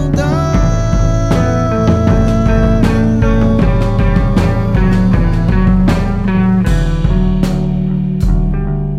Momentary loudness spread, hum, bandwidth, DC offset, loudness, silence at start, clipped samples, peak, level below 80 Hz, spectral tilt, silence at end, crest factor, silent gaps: 3 LU; none; 9.4 kHz; under 0.1%; -13 LUFS; 0 s; under 0.1%; 0 dBFS; -16 dBFS; -8 dB/octave; 0 s; 10 dB; none